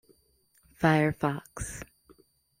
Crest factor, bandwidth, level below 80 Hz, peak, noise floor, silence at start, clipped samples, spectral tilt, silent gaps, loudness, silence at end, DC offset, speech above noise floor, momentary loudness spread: 22 dB; 15.5 kHz; -52 dBFS; -8 dBFS; -68 dBFS; 0.8 s; under 0.1%; -6 dB/octave; none; -28 LUFS; 0.75 s; under 0.1%; 40 dB; 18 LU